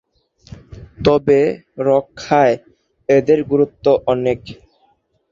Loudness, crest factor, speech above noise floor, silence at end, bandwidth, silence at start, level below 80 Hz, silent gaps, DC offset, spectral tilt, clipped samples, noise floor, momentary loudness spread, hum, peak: -16 LUFS; 16 dB; 45 dB; 0.8 s; 7.4 kHz; 0.7 s; -46 dBFS; none; under 0.1%; -7 dB/octave; under 0.1%; -60 dBFS; 9 LU; none; -2 dBFS